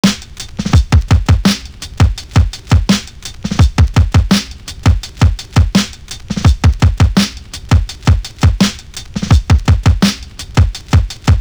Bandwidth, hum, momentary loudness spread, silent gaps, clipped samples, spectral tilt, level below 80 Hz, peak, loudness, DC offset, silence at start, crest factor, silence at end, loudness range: over 20 kHz; none; 12 LU; none; under 0.1%; -5.5 dB/octave; -16 dBFS; 0 dBFS; -13 LUFS; under 0.1%; 0.05 s; 12 dB; 0 s; 0 LU